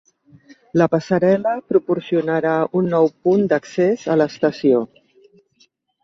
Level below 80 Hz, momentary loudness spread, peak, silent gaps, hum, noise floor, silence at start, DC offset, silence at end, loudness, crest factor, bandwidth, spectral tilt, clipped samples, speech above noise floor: -62 dBFS; 3 LU; -2 dBFS; none; none; -60 dBFS; 0.75 s; under 0.1%; 1.2 s; -18 LUFS; 16 dB; 7.6 kHz; -7.5 dB/octave; under 0.1%; 42 dB